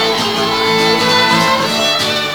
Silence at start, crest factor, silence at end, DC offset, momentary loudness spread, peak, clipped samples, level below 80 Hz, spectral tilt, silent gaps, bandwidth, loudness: 0 s; 14 dB; 0 s; under 0.1%; 4 LU; 0 dBFS; under 0.1%; -46 dBFS; -3 dB/octave; none; over 20 kHz; -12 LUFS